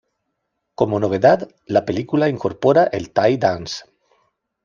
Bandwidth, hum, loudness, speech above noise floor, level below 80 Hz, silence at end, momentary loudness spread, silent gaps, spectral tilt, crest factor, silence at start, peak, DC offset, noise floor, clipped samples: 7.4 kHz; none; -18 LUFS; 57 dB; -56 dBFS; 0.85 s; 7 LU; none; -6.5 dB/octave; 18 dB; 0.8 s; -2 dBFS; under 0.1%; -75 dBFS; under 0.1%